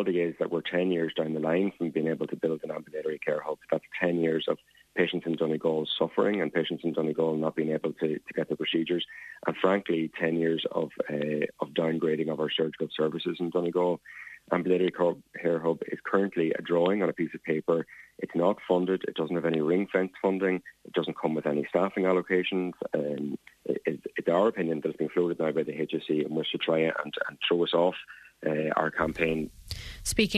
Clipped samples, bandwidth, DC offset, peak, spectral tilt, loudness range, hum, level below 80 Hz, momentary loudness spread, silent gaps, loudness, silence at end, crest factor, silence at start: under 0.1%; 13.5 kHz; under 0.1%; -10 dBFS; -5.5 dB/octave; 2 LU; none; -58 dBFS; 7 LU; none; -29 LUFS; 0 s; 18 dB; 0 s